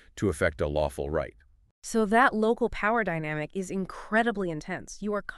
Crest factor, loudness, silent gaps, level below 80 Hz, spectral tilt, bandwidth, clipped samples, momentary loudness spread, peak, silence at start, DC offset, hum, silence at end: 20 dB; -28 LUFS; 1.71-1.82 s; -46 dBFS; -5.5 dB/octave; 13 kHz; under 0.1%; 12 LU; -8 dBFS; 0.15 s; under 0.1%; none; 0 s